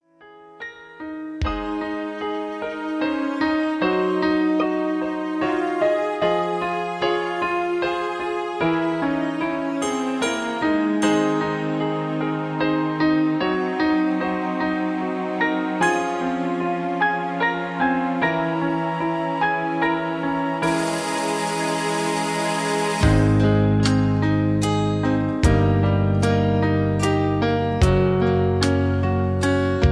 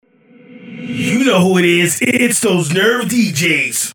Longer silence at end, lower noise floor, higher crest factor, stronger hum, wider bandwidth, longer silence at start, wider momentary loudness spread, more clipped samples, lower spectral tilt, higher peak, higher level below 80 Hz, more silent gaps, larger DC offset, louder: about the same, 0 s vs 0 s; about the same, -47 dBFS vs -44 dBFS; about the same, 16 dB vs 14 dB; neither; second, 11 kHz vs 19.5 kHz; second, 0.2 s vs 0.5 s; second, 6 LU vs 9 LU; neither; first, -6 dB/octave vs -4 dB/octave; second, -4 dBFS vs 0 dBFS; first, -36 dBFS vs -62 dBFS; neither; neither; second, -22 LUFS vs -13 LUFS